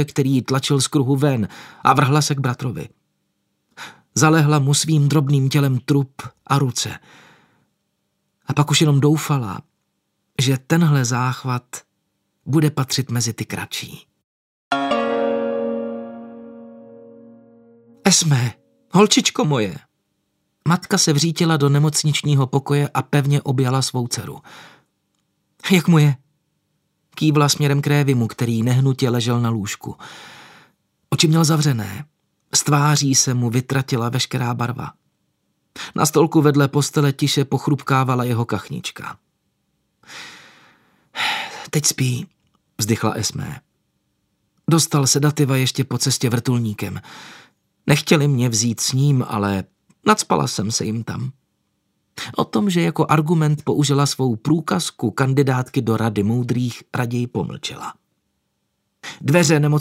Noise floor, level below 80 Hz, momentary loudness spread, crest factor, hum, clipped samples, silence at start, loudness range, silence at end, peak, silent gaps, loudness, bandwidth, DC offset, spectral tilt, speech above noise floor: -72 dBFS; -60 dBFS; 17 LU; 20 dB; none; under 0.1%; 0 s; 5 LU; 0 s; 0 dBFS; 14.24-14.71 s; -19 LUFS; 16 kHz; under 0.1%; -5 dB/octave; 54 dB